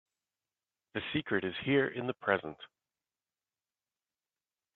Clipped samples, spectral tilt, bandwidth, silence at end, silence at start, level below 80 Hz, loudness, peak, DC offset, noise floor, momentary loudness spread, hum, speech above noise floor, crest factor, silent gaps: under 0.1%; -8.5 dB/octave; 4.3 kHz; 2.1 s; 0.95 s; -72 dBFS; -33 LUFS; -12 dBFS; under 0.1%; under -90 dBFS; 13 LU; none; over 57 dB; 26 dB; none